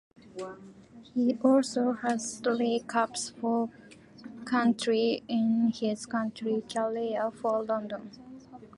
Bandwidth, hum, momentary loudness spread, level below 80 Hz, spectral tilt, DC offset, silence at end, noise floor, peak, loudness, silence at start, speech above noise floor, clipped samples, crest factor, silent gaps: 11.5 kHz; none; 18 LU; -70 dBFS; -4.5 dB/octave; under 0.1%; 0.1 s; -49 dBFS; -10 dBFS; -29 LUFS; 0.25 s; 20 dB; under 0.1%; 20 dB; none